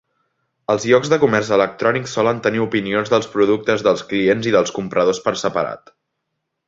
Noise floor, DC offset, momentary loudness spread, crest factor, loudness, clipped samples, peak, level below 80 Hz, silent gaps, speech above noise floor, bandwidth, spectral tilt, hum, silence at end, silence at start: -76 dBFS; under 0.1%; 6 LU; 18 dB; -18 LUFS; under 0.1%; 0 dBFS; -56 dBFS; none; 59 dB; 7.8 kHz; -5 dB/octave; none; 0.9 s; 0.7 s